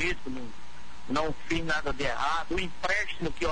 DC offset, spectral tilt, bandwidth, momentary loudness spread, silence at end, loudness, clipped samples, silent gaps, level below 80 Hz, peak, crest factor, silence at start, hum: 3%; -4 dB/octave; 10.5 kHz; 16 LU; 0 s; -31 LUFS; under 0.1%; none; -44 dBFS; -14 dBFS; 16 dB; 0 s; none